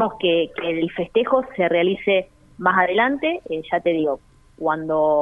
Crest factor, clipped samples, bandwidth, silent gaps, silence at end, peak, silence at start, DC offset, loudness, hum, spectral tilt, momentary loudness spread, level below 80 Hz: 18 dB; under 0.1%; 3.9 kHz; none; 0 s; -2 dBFS; 0 s; under 0.1%; -21 LUFS; none; -7.5 dB/octave; 7 LU; -54 dBFS